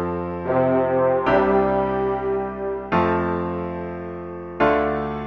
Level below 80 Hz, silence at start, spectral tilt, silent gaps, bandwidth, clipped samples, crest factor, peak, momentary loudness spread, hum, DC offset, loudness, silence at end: -44 dBFS; 0 s; -9 dB/octave; none; 6.2 kHz; under 0.1%; 16 dB; -6 dBFS; 12 LU; none; under 0.1%; -21 LUFS; 0 s